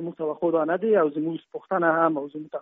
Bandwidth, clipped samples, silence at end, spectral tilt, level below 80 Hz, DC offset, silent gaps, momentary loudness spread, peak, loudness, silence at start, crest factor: 3.9 kHz; under 0.1%; 0 s; -6 dB/octave; -74 dBFS; under 0.1%; none; 10 LU; -6 dBFS; -24 LUFS; 0 s; 18 dB